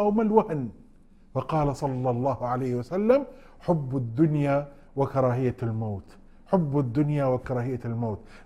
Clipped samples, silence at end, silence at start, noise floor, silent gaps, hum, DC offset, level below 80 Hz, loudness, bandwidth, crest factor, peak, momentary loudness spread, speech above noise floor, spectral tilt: under 0.1%; 0.05 s; 0 s; -53 dBFS; none; none; under 0.1%; -50 dBFS; -27 LUFS; 11 kHz; 20 dB; -6 dBFS; 10 LU; 27 dB; -9.5 dB/octave